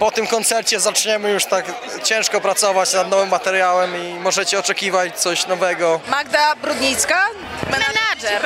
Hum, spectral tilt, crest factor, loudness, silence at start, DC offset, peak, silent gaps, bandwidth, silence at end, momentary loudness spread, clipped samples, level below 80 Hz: none; -1 dB/octave; 16 dB; -17 LUFS; 0 s; under 0.1%; -2 dBFS; none; 16 kHz; 0 s; 4 LU; under 0.1%; -54 dBFS